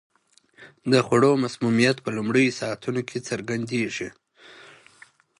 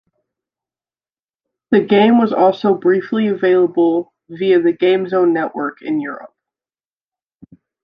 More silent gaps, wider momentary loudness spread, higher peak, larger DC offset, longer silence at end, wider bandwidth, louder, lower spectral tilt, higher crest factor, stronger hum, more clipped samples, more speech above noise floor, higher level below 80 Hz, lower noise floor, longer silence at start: neither; about the same, 11 LU vs 10 LU; about the same, -4 dBFS vs -2 dBFS; neither; second, 0.75 s vs 1.6 s; first, 11.5 kHz vs 5.2 kHz; second, -23 LUFS vs -15 LUFS; second, -5.5 dB/octave vs -8.5 dB/octave; first, 22 dB vs 16 dB; neither; neither; second, 36 dB vs over 76 dB; about the same, -64 dBFS vs -64 dBFS; second, -59 dBFS vs under -90 dBFS; second, 0.6 s vs 1.7 s